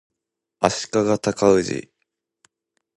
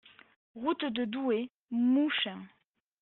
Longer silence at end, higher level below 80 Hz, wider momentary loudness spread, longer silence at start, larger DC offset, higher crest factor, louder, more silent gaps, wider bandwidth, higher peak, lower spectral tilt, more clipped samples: first, 1.15 s vs 0.55 s; first, -54 dBFS vs -78 dBFS; about the same, 9 LU vs 9 LU; about the same, 0.6 s vs 0.55 s; neither; first, 22 dB vs 14 dB; first, -21 LUFS vs -31 LUFS; second, none vs 1.50-1.69 s; first, 11.5 kHz vs 4.2 kHz; first, 0 dBFS vs -18 dBFS; first, -4.5 dB/octave vs -2.5 dB/octave; neither